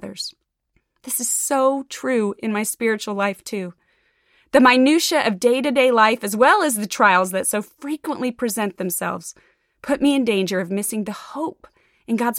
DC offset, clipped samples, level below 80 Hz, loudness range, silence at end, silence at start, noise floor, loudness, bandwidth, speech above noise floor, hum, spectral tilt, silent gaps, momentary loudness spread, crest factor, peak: under 0.1%; under 0.1%; -62 dBFS; 7 LU; 0 s; 0 s; -68 dBFS; -19 LUFS; 17 kHz; 49 dB; none; -3 dB/octave; none; 15 LU; 18 dB; -4 dBFS